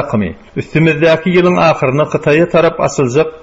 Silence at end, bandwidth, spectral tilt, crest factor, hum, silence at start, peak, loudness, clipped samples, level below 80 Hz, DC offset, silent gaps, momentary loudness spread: 0.05 s; 8 kHz; -6.5 dB/octave; 12 dB; none; 0 s; 0 dBFS; -12 LUFS; under 0.1%; -42 dBFS; under 0.1%; none; 8 LU